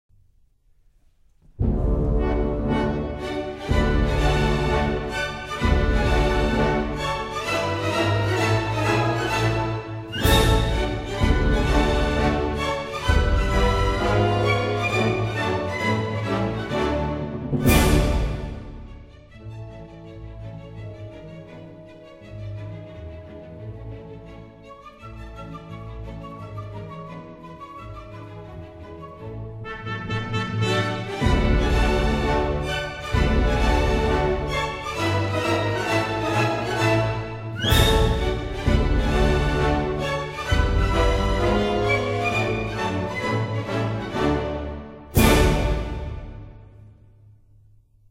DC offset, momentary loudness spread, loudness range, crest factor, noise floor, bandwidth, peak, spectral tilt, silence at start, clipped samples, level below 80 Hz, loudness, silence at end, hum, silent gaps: under 0.1%; 18 LU; 17 LU; 20 dB; -58 dBFS; 16 kHz; -2 dBFS; -5.5 dB/octave; 1.55 s; under 0.1%; -28 dBFS; -23 LUFS; 1.25 s; none; none